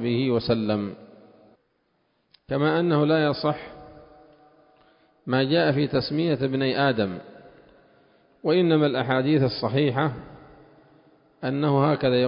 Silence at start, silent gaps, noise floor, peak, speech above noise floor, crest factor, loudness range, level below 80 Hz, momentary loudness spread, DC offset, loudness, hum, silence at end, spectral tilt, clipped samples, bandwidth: 0 s; none; -70 dBFS; -8 dBFS; 47 dB; 16 dB; 2 LU; -58 dBFS; 11 LU; under 0.1%; -23 LUFS; none; 0 s; -11 dB/octave; under 0.1%; 5.4 kHz